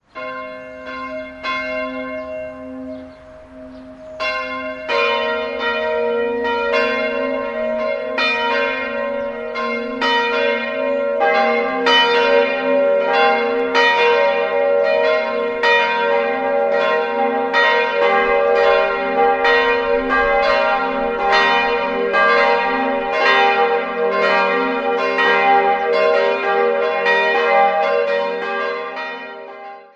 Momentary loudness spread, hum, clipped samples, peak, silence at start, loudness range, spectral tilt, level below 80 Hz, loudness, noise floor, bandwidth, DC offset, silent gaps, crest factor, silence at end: 14 LU; none; under 0.1%; -2 dBFS; 0.15 s; 8 LU; -3.5 dB/octave; -50 dBFS; -16 LUFS; -39 dBFS; 7.8 kHz; under 0.1%; none; 16 dB; 0.15 s